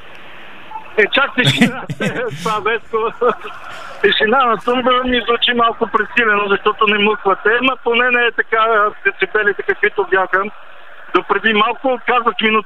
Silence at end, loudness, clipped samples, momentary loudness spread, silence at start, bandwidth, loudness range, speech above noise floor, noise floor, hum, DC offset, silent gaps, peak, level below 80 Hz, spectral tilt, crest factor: 0.05 s; -15 LUFS; under 0.1%; 8 LU; 0.05 s; 14.5 kHz; 3 LU; 22 dB; -37 dBFS; none; 2%; none; 0 dBFS; -50 dBFS; -4.5 dB/octave; 16 dB